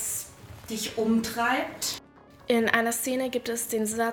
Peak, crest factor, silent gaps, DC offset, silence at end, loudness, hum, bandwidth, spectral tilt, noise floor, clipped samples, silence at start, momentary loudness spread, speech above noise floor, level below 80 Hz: -6 dBFS; 22 dB; none; under 0.1%; 0 s; -27 LUFS; none; over 20 kHz; -2.5 dB/octave; -52 dBFS; under 0.1%; 0 s; 14 LU; 25 dB; -60 dBFS